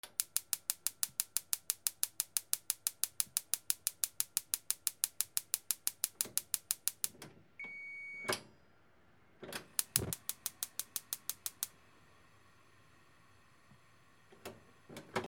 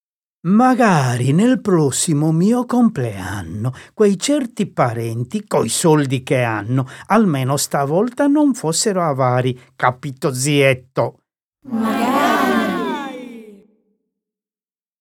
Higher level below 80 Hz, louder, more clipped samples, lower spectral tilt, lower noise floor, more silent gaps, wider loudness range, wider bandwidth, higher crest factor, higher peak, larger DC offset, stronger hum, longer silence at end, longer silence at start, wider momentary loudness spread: second, -76 dBFS vs -58 dBFS; second, -37 LUFS vs -17 LUFS; neither; second, -0.5 dB/octave vs -5.5 dB/octave; second, -68 dBFS vs under -90 dBFS; second, none vs 11.44-11.52 s; first, 9 LU vs 4 LU; first, over 20 kHz vs 17.5 kHz; first, 36 dB vs 16 dB; second, -6 dBFS vs 0 dBFS; neither; neither; second, 0 s vs 1.45 s; second, 0.05 s vs 0.45 s; about the same, 12 LU vs 10 LU